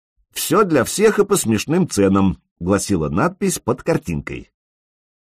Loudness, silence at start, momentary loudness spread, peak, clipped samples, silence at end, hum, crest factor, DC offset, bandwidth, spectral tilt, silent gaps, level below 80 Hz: -18 LUFS; 0.35 s; 11 LU; -4 dBFS; under 0.1%; 0.9 s; none; 16 dB; under 0.1%; 15.5 kHz; -5 dB/octave; 2.51-2.56 s; -42 dBFS